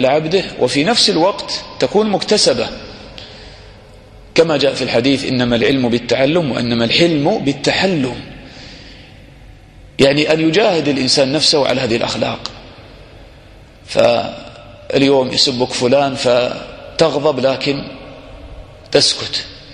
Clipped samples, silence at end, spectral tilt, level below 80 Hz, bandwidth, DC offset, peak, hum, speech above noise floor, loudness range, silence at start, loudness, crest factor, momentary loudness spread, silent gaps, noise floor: under 0.1%; 0 s; -4 dB/octave; -44 dBFS; 11.5 kHz; under 0.1%; 0 dBFS; none; 26 dB; 4 LU; 0 s; -14 LUFS; 16 dB; 19 LU; none; -40 dBFS